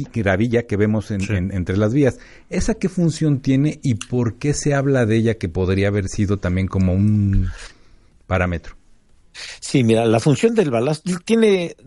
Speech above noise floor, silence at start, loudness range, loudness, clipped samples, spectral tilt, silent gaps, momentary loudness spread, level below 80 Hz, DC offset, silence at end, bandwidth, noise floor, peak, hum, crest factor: 32 dB; 0 s; 3 LU; -19 LUFS; under 0.1%; -6.5 dB/octave; none; 8 LU; -36 dBFS; under 0.1%; 0.15 s; 11.5 kHz; -50 dBFS; -2 dBFS; none; 16 dB